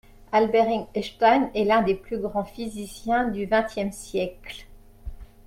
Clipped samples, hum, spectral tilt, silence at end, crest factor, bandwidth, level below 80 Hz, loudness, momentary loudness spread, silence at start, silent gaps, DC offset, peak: under 0.1%; none; -5.5 dB/octave; 0.2 s; 20 dB; 16 kHz; -46 dBFS; -24 LUFS; 20 LU; 0.3 s; none; under 0.1%; -4 dBFS